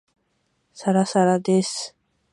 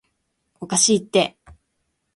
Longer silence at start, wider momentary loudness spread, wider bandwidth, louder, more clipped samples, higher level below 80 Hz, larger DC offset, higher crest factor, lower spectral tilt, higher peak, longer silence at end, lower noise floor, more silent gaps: first, 0.75 s vs 0.6 s; about the same, 12 LU vs 11 LU; about the same, 11.5 kHz vs 11.5 kHz; about the same, -21 LUFS vs -19 LUFS; neither; second, -72 dBFS vs -58 dBFS; neither; about the same, 18 dB vs 20 dB; first, -5.5 dB/octave vs -2.5 dB/octave; about the same, -6 dBFS vs -4 dBFS; second, 0.45 s vs 0.85 s; about the same, -70 dBFS vs -73 dBFS; neither